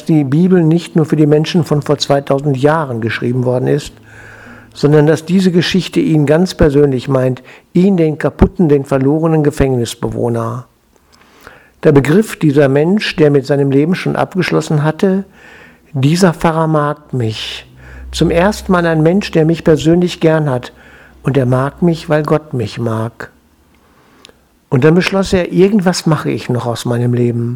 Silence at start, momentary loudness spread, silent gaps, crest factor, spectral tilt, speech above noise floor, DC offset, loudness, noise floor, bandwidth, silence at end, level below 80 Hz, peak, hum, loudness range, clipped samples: 0 s; 8 LU; none; 12 dB; -7 dB/octave; 38 dB; under 0.1%; -13 LUFS; -50 dBFS; 16 kHz; 0 s; -34 dBFS; 0 dBFS; none; 4 LU; 0.2%